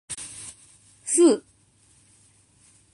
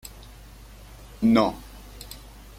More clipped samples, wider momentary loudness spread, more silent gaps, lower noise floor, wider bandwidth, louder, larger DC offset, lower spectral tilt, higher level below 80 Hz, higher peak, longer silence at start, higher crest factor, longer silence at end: neither; second, 21 LU vs 27 LU; neither; first, -60 dBFS vs -45 dBFS; second, 11.5 kHz vs 16 kHz; about the same, -22 LUFS vs -22 LUFS; neither; second, -3 dB/octave vs -6 dB/octave; second, -68 dBFS vs -46 dBFS; about the same, -6 dBFS vs -8 dBFS; about the same, 0.1 s vs 0.05 s; about the same, 20 dB vs 20 dB; first, 1.55 s vs 0.4 s